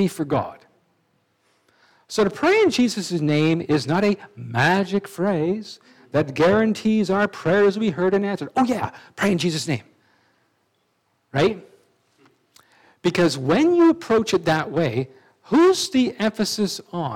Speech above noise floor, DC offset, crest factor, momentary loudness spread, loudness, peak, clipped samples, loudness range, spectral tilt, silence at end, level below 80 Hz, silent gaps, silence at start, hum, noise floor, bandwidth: 48 dB; under 0.1%; 16 dB; 10 LU; -21 LUFS; -6 dBFS; under 0.1%; 7 LU; -5.5 dB/octave; 0 s; -60 dBFS; none; 0 s; none; -68 dBFS; 16.5 kHz